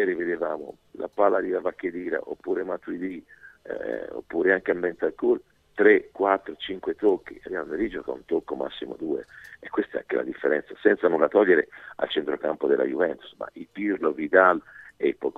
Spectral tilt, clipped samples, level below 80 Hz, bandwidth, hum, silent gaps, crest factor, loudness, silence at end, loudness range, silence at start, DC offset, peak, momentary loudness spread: -7 dB/octave; under 0.1%; -62 dBFS; 4.3 kHz; none; none; 24 dB; -25 LUFS; 0.05 s; 6 LU; 0 s; under 0.1%; -2 dBFS; 14 LU